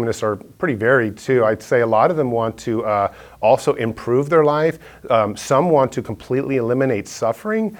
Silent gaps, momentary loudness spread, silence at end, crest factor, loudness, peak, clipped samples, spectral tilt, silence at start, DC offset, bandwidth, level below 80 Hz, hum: none; 8 LU; 0 s; 16 dB; -18 LUFS; -2 dBFS; under 0.1%; -6.5 dB/octave; 0 s; under 0.1%; 18 kHz; -52 dBFS; none